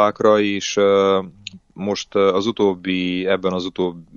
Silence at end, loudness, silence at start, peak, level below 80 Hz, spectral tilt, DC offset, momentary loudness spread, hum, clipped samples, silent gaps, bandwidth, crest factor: 0.15 s; -19 LUFS; 0 s; -2 dBFS; -58 dBFS; -5 dB/octave; under 0.1%; 11 LU; none; under 0.1%; none; 7.4 kHz; 18 dB